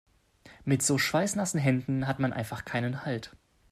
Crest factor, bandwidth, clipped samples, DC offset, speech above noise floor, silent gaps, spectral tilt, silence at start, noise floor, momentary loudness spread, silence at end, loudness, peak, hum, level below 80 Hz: 16 dB; 15.5 kHz; under 0.1%; under 0.1%; 28 dB; none; -4.5 dB/octave; 0.45 s; -57 dBFS; 10 LU; 0.4 s; -29 LUFS; -14 dBFS; none; -60 dBFS